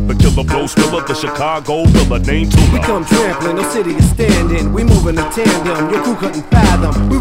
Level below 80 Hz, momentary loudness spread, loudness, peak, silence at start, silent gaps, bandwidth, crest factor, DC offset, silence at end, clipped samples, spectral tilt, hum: -18 dBFS; 6 LU; -13 LUFS; 0 dBFS; 0 s; none; 16.5 kHz; 12 dB; under 0.1%; 0 s; 0.6%; -6 dB/octave; none